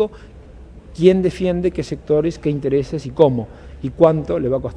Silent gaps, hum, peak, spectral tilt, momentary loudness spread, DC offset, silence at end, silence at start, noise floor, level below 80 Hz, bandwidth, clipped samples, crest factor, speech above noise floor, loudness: none; none; 0 dBFS; -8 dB/octave; 12 LU; under 0.1%; 0 s; 0 s; -39 dBFS; -40 dBFS; 10.5 kHz; under 0.1%; 18 dB; 22 dB; -18 LUFS